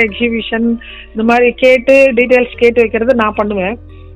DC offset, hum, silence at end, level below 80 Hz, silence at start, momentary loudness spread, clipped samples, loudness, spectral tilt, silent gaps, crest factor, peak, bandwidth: under 0.1%; none; 0 s; -36 dBFS; 0 s; 11 LU; 0.8%; -11 LUFS; -6 dB/octave; none; 12 dB; 0 dBFS; 9.6 kHz